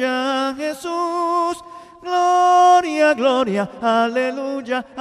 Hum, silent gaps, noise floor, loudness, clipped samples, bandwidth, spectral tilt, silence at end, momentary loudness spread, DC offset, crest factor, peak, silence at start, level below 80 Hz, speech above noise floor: none; none; -39 dBFS; -18 LUFS; under 0.1%; 13.5 kHz; -4 dB/octave; 0 s; 12 LU; under 0.1%; 14 dB; -4 dBFS; 0 s; -62 dBFS; 20 dB